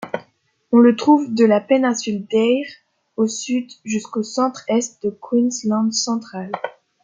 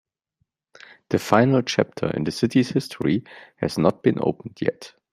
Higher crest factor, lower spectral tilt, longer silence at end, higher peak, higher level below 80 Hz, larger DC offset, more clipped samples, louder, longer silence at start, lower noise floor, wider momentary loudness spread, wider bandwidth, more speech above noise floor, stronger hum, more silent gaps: second, 16 dB vs 22 dB; second, -4.5 dB/octave vs -6.5 dB/octave; about the same, 0.35 s vs 0.25 s; about the same, -2 dBFS vs -2 dBFS; second, -68 dBFS vs -58 dBFS; neither; neither; first, -19 LUFS vs -22 LUFS; second, 0 s vs 1.1 s; second, -60 dBFS vs -74 dBFS; first, 15 LU vs 9 LU; second, 9.2 kHz vs 15 kHz; second, 42 dB vs 52 dB; neither; neither